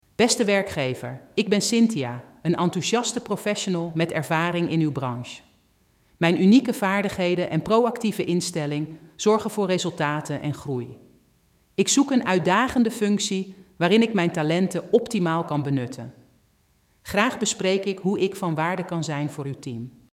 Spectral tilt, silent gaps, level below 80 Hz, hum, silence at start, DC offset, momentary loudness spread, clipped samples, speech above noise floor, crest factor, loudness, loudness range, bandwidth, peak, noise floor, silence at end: -5 dB/octave; none; -60 dBFS; none; 0.2 s; under 0.1%; 12 LU; under 0.1%; 40 dB; 18 dB; -23 LUFS; 4 LU; 16 kHz; -4 dBFS; -63 dBFS; 0.25 s